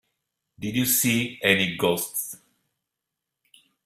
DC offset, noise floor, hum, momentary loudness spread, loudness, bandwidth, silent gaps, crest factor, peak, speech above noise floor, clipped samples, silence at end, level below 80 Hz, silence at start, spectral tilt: under 0.1%; -85 dBFS; none; 15 LU; -23 LUFS; 16 kHz; none; 24 dB; -4 dBFS; 60 dB; under 0.1%; 1.5 s; -62 dBFS; 0.6 s; -3 dB/octave